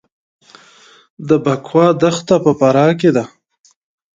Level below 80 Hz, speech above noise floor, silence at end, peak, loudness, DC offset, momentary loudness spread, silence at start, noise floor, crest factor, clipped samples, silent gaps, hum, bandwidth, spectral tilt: -58 dBFS; 33 dB; 0.9 s; 0 dBFS; -13 LUFS; under 0.1%; 7 LU; 1.2 s; -46 dBFS; 16 dB; under 0.1%; none; none; 9.2 kHz; -6.5 dB/octave